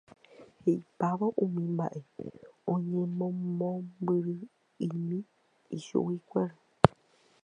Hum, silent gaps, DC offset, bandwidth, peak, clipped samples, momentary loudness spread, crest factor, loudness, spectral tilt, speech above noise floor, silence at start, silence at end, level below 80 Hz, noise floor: none; none; under 0.1%; 9.8 kHz; 0 dBFS; under 0.1%; 15 LU; 32 dB; -32 LUFS; -8.5 dB/octave; 33 dB; 0.4 s; 0.55 s; -60 dBFS; -65 dBFS